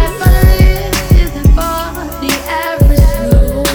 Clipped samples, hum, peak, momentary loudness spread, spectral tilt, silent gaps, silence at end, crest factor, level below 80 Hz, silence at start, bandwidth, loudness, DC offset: 2%; none; 0 dBFS; 8 LU; -5.5 dB/octave; none; 0 s; 10 dB; -12 dBFS; 0 s; over 20 kHz; -12 LUFS; under 0.1%